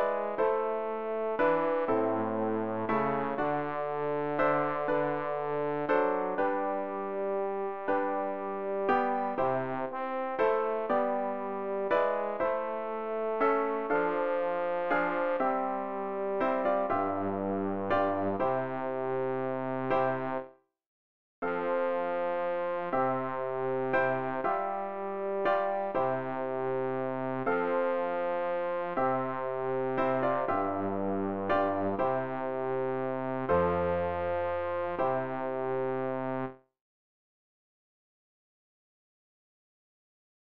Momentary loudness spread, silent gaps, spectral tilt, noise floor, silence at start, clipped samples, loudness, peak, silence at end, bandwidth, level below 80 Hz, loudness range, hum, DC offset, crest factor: 6 LU; 20.86-21.42 s; -9 dB/octave; under -90 dBFS; 0 s; under 0.1%; -31 LUFS; -14 dBFS; 3.6 s; 5.4 kHz; -64 dBFS; 3 LU; none; 0.4%; 16 dB